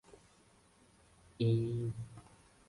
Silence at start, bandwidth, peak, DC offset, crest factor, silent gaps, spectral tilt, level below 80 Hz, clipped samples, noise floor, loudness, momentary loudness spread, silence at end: 1.4 s; 11.5 kHz; -22 dBFS; under 0.1%; 18 dB; none; -8.5 dB/octave; -64 dBFS; under 0.1%; -66 dBFS; -36 LUFS; 18 LU; 0.5 s